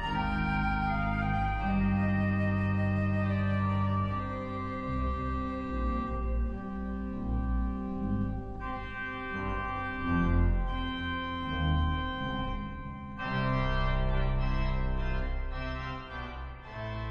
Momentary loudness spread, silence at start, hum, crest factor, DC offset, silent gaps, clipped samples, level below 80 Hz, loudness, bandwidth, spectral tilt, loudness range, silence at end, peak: 9 LU; 0 s; none; 14 dB; under 0.1%; none; under 0.1%; -36 dBFS; -32 LUFS; 6.6 kHz; -8.5 dB/octave; 5 LU; 0 s; -16 dBFS